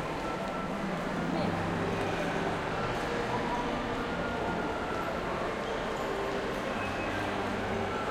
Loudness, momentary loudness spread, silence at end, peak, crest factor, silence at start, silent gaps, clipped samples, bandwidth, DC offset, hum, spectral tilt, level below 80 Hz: -33 LUFS; 2 LU; 0 s; -20 dBFS; 14 dB; 0 s; none; under 0.1%; 16.5 kHz; under 0.1%; none; -5.5 dB/octave; -48 dBFS